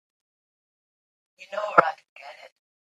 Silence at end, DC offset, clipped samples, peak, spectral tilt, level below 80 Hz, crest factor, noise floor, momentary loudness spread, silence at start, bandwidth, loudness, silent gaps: 0.4 s; under 0.1%; under 0.1%; 0 dBFS; -5 dB/octave; -80 dBFS; 30 dB; under -90 dBFS; 24 LU; 1.4 s; 9.6 kHz; -23 LUFS; 2.09-2.16 s